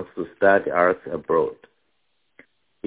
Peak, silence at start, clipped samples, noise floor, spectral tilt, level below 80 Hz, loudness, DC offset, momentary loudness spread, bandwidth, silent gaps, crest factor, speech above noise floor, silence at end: -4 dBFS; 0 s; under 0.1%; -73 dBFS; -9.5 dB/octave; -60 dBFS; -21 LUFS; under 0.1%; 11 LU; 4 kHz; none; 20 dB; 52 dB; 1.3 s